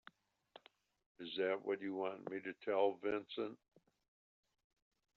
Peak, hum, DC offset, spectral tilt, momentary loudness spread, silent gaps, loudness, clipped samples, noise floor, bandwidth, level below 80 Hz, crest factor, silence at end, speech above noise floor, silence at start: -24 dBFS; none; under 0.1%; -2.5 dB/octave; 10 LU; none; -41 LUFS; under 0.1%; -68 dBFS; 6 kHz; -86 dBFS; 20 dB; 1.6 s; 27 dB; 1.2 s